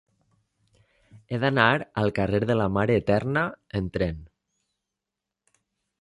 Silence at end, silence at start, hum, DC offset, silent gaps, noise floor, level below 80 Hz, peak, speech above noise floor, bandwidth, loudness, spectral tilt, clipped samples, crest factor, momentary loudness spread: 1.75 s; 1.15 s; none; under 0.1%; none; -87 dBFS; -48 dBFS; -4 dBFS; 63 dB; 11 kHz; -25 LUFS; -7.5 dB/octave; under 0.1%; 24 dB; 9 LU